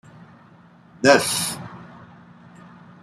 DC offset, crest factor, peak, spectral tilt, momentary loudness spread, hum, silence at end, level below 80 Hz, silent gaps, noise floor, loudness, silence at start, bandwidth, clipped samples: under 0.1%; 22 dB; -2 dBFS; -3 dB/octave; 23 LU; none; 1.15 s; -64 dBFS; none; -50 dBFS; -19 LUFS; 1 s; 15.5 kHz; under 0.1%